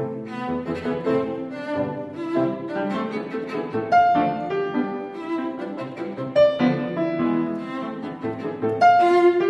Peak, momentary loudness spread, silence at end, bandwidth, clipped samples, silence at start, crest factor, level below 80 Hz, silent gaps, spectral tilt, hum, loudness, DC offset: -6 dBFS; 13 LU; 0 s; 8.8 kHz; under 0.1%; 0 s; 16 dB; -60 dBFS; none; -7.5 dB/octave; none; -23 LUFS; under 0.1%